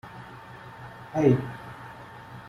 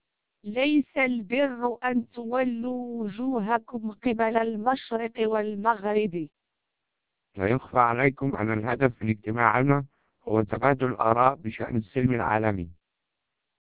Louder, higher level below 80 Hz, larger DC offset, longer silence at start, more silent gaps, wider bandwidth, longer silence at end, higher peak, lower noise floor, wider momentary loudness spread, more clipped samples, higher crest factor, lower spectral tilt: about the same, -25 LUFS vs -26 LUFS; second, -60 dBFS vs -54 dBFS; second, under 0.1% vs 0.1%; second, 0.05 s vs 0.45 s; neither; first, 12.5 kHz vs 4 kHz; second, 0 s vs 0.95 s; second, -8 dBFS vs -4 dBFS; second, -44 dBFS vs -83 dBFS; first, 21 LU vs 9 LU; neither; about the same, 22 dB vs 22 dB; second, -8.5 dB/octave vs -10.5 dB/octave